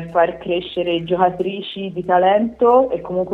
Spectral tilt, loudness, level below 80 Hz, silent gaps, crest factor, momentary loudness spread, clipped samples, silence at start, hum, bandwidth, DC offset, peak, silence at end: -8 dB/octave; -18 LUFS; -52 dBFS; none; 16 dB; 10 LU; under 0.1%; 0 s; none; 4.4 kHz; under 0.1%; -2 dBFS; 0 s